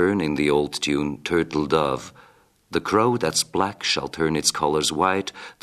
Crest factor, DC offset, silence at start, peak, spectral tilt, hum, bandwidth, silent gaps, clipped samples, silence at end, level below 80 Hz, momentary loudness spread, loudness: 18 dB; under 0.1%; 0 s; -6 dBFS; -3.5 dB/octave; none; 14 kHz; none; under 0.1%; 0.1 s; -50 dBFS; 7 LU; -22 LUFS